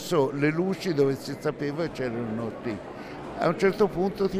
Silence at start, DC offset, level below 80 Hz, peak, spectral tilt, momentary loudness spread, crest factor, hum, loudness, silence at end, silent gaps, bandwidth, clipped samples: 0 s; under 0.1%; -54 dBFS; -8 dBFS; -6.5 dB/octave; 11 LU; 18 dB; none; -27 LUFS; 0 s; none; 15.5 kHz; under 0.1%